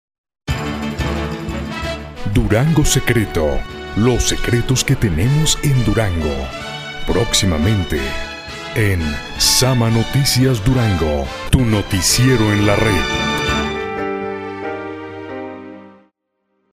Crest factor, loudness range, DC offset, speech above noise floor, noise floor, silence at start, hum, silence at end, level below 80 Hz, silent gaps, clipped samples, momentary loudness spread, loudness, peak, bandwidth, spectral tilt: 16 dB; 4 LU; under 0.1%; 54 dB; -69 dBFS; 0.45 s; none; 0.8 s; -28 dBFS; none; under 0.1%; 12 LU; -17 LUFS; 0 dBFS; 16 kHz; -4.5 dB/octave